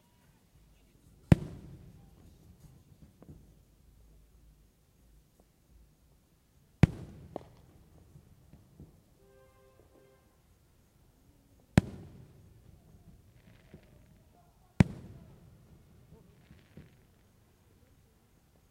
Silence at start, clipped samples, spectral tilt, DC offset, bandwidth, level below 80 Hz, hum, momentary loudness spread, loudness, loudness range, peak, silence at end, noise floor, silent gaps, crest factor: 1.3 s; under 0.1%; -7.5 dB/octave; under 0.1%; 16 kHz; -52 dBFS; none; 31 LU; -31 LUFS; 17 LU; -6 dBFS; 3.8 s; -66 dBFS; none; 34 dB